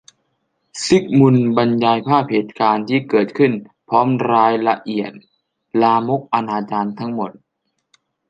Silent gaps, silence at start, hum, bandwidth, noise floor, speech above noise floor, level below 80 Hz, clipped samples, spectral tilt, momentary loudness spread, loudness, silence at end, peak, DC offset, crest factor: none; 0.75 s; none; 9.8 kHz; -73 dBFS; 57 dB; -60 dBFS; under 0.1%; -6.5 dB/octave; 11 LU; -17 LUFS; 1 s; 0 dBFS; under 0.1%; 16 dB